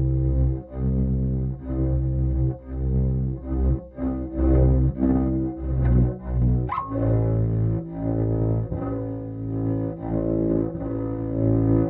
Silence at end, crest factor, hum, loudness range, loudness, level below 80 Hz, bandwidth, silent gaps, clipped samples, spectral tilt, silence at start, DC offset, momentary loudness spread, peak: 0 s; 14 dB; none; 3 LU; -24 LUFS; -28 dBFS; 2.6 kHz; none; under 0.1%; -12.5 dB/octave; 0 s; under 0.1%; 7 LU; -8 dBFS